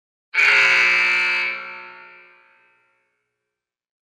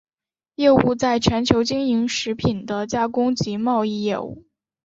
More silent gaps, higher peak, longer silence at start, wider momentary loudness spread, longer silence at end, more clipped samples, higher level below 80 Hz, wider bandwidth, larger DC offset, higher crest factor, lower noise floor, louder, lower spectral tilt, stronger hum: neither; about the same, -4 dBFS vs -2 dBFS; second, 0.35 s vs 0.6 s; first, 19 LU vs 8 LU; first, 2.25 s vs 0.45 s; neither; second, -82 dBFS vs -46 dBFS; first, 15.5 kHz vs 8 kHz; neither; about the same, 18 dB vs 20 dB; second, -84 dBFS vs under -90 dBFS; first, -15 LUFS vs -20 LUFS; second, 0 dB/octave vs -5.5 dB/octave; first, 60 Hz at -60 dBFS vs none